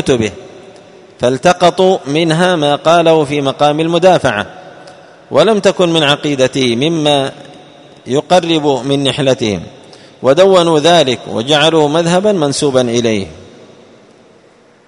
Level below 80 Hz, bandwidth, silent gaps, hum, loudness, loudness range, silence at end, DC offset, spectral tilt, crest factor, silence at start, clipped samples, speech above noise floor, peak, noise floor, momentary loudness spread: -48 dBFS; 11 kHz; none; none; -11 LUFS; 3 LU; 1.45 s; under 0.1%; -5 dB/octave; 12 dB; 0 s; 0.2%; 34 dB; 0 dBFS; -45 dBFS; 8 LU